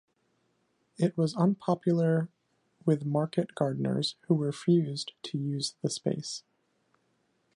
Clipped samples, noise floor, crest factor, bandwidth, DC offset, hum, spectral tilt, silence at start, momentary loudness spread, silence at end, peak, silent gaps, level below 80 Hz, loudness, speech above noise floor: under 0.1%; -74 dBFS; 18 dB; 11.5 kHz; under 0.1%; none; -6.5 dB/octave; 1 s; 9 LU; 1.15 s; -12 dBFS; none; -76 dBFS; -30 LUFS; 45 dB